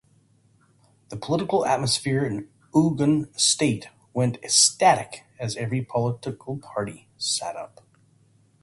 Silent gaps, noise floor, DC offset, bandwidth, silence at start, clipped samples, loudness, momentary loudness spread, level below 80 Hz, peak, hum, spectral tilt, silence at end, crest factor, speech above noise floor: none; -61 dBFS; under 0.1%; 11.5 kHz; 1.1 s; under 0.1%; -23 LUFS; 17 LU; -60 dBFS; -4 dBFS; none; -3.5 dB/octave; 0.95 s; 20 dB; 37 dB